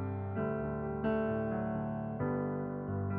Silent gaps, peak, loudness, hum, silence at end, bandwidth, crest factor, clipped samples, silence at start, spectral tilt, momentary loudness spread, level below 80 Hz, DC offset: none; -22 dBFS; -36 LUFS; none; 0 s; 3.6 kHz; 12 dB; under 0.1%; 0 s; -9 dB/octave; 4 LU; -56 dBFS; under 0.1%